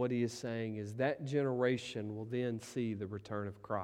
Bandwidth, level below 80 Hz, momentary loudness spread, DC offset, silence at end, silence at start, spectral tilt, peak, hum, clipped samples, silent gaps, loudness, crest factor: 15 kHz; -74 dBFS; 8 LU; under 0.1%; 0 s; 0 s; -6.5 dB/octave; -20 dBFS; none; under 0.1%; none; -38 LUFS; 18 dB